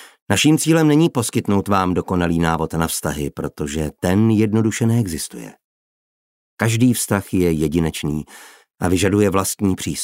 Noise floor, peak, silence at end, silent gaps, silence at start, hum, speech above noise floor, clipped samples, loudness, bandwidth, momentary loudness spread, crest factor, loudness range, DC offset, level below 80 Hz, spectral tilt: under -90 dBFS; -2 dBFS; 0 s; 0.22-0.26 s, 5.64-6.57 s; 0 s; none; over 72 dB; under 0.1%; -18 LUFS; 16.5 kHz; 10 LU; 18 dB; 3 LU; under 0.1%; -42 dBFS; -5.5 dB/octave